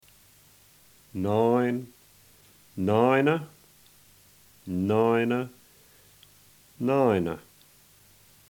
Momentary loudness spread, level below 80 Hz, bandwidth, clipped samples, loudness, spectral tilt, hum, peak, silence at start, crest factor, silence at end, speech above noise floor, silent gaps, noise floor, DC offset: 19 LU; -64 dBFS; 20 kHz; under 0.1%; -25 LUFS; -7.5 dB/octave; none; -8 dBFS; 1.15 s; 20 dB; 1.1 s; 33 dB; none; -57 dBFS; under 0.1%